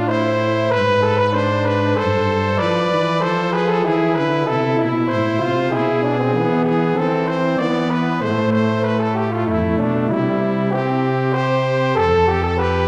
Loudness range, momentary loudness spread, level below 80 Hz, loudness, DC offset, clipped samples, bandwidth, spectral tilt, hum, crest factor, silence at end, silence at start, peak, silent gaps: 1 LU; 3 LU; -44 dBFS; -18 LUFS; 0.2%; under 0.1%; 9.4 kHz; -7.5 dB/octave; none; 14 dB; 0 s; 0 s; -4 dBFS; none